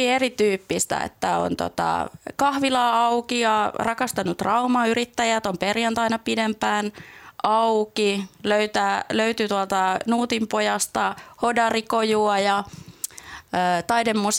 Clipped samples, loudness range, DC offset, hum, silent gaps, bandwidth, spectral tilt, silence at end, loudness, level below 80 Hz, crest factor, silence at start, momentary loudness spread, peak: under 0.1%; 1 LU; under 0.1%; none; none; 17.5 kHz; -3.5 dB/octave; 0 s; -22 LUFS; -58 dBFS; 16 dB; 0 s; 7 LU; -6 dBFS